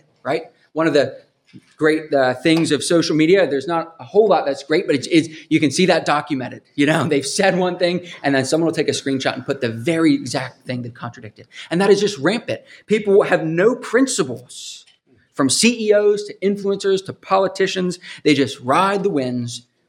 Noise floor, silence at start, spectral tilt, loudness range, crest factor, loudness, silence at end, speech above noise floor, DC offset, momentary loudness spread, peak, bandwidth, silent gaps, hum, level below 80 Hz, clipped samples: -54 dBFS; 0.25 s; -4.5 dB/octave; 3 LU; 18 dB; -18 LUFS; 0.3 s; 36 dB; under 0.1%; 12 LU; -2 dBFS; 14.5 kHz; none; none; -66 dBFS; under 0.1%